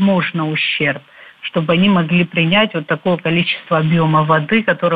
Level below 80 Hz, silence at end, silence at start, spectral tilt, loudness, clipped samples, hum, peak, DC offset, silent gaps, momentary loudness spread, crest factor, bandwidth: -54 dBFS; 0 s; 0 s; -9 dB/octave; -15 LUFS; under 0.1%; none; -2 dBFS; under 0.1%; none; 6 LU; 14 dB; 4.8 kHz